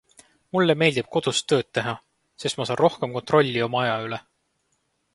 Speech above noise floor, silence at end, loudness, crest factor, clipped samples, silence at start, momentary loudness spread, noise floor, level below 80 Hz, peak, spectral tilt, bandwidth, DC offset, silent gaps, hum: 49 dB; 0.95 s; -23 LUFS; 22 dB; under 0.1%; 0.55 s; 11 LU; -72 dBFS; -64 dBFS; -4 dBFS; -4.5 dB/octave; 11.5 kHz; under 0.1%; none; none